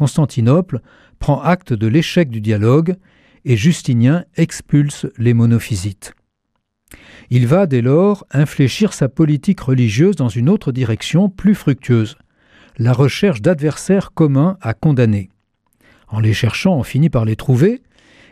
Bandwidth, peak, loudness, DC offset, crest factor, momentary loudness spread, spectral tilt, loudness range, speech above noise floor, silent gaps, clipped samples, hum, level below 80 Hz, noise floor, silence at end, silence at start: 14 kHz; -2 dBFS; -15 LUFS; under 0.1%; 14 dB; 7 LU; -7 dB/octave; 2 LU; 56 dB; none; under 0.1%; none; -44 dBFS; -71 dBFS; 0.55 s; 0 s